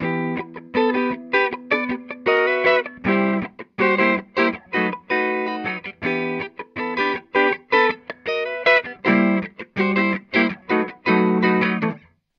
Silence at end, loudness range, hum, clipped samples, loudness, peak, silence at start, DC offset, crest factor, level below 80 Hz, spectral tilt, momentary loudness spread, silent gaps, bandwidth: 0.4 s; 3 LU; none; under 0.1%; -20 LUFS; -4 dBFS; 0 s; under 0.1%; 18 dB; -62 dBFS; -7.5 dB/octave; 9 LU; none; 6.8 kHz